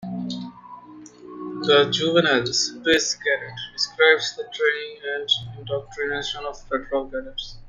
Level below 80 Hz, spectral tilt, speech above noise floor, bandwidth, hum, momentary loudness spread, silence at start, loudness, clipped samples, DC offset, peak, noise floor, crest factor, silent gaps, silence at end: -52 dBFS; -2.5 dB/octave; 21 dB; 9.6 kHz; none; 16 LU; 0 s; -22 LUFS; under 0.1%; under 0.1%; -2 dBFS; -44 dBFS; 20 dB; none; 0 s